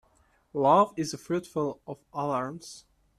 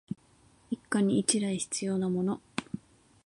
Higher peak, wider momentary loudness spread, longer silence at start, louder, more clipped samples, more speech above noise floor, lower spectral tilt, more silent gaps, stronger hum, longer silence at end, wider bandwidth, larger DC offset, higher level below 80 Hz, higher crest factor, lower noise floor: about the same, -8 dBFS vs -8 dBFS; first, 21 LU vs 17 LU; first, 0.55 s vs 0.1 s; about the same, -28 LUFS vs -30 LUFS; neither; first, 38 dB vs 34 dB; first, -6 dB/octave vs -4.5 dB/octave; neither; neither; about the same, 0.4 s vs 0.5 s; first, 13.5 kHz vs 11.5 kHz; neither; about the same, -68 dBFS vs -68 dBFS; about the same, 20 dB vs 24 dB; about the same, -66 dBFS vs -63 dBFS